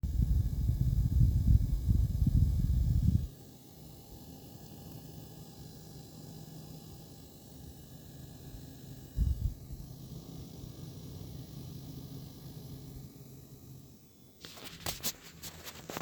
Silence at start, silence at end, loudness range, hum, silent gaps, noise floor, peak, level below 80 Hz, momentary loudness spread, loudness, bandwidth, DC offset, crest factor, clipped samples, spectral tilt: 0.05 s; 0 s; 18 LU; none; none; -57 dBFS; -12 dBFS; -38 dBFS; 21 LU; -34 LUFS; over 20 kHz; under 0.1%; 22 dB; under 0.1%; -6 dB/octave